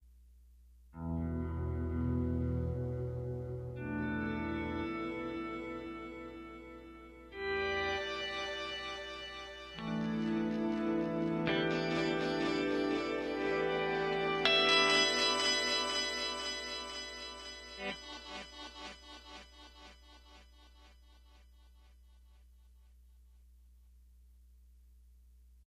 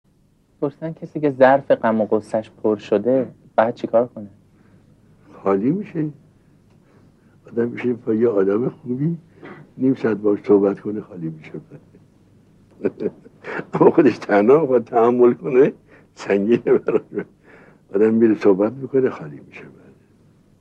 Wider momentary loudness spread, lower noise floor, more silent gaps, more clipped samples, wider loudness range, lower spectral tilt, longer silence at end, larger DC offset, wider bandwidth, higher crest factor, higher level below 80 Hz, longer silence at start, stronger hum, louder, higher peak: about the same, 19 LU vs 17 LU; about the same, -61 dBFS vs -58 dBFS; neither; neither; first, 16 LU vs 8 LU; second, -4 dB/octave vs -8.5 dB/octave; second, 0.15 s vs 0.9 s; neither; first, 13.5 kHz vs 8.4 kHz; first, 26 dB vs 20 dB; first, -52 dBFS vs -64 dBFS; second, 0 s vs 0.6 s; neither; second, -35 LUFS vs -19 LUFS; second, -10 dBFS vs 0 dBFS